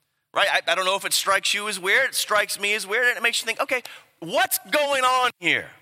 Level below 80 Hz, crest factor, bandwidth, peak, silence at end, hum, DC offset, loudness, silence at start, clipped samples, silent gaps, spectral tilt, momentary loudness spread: -76 dBFS; 20 dB; 16.5 kHz; -4 dBFS; 0.1 s; none; under 0.1%; -21 LUFS; 0.35 s; under 0.1%; none; -0.5 dB/octave; 6 LU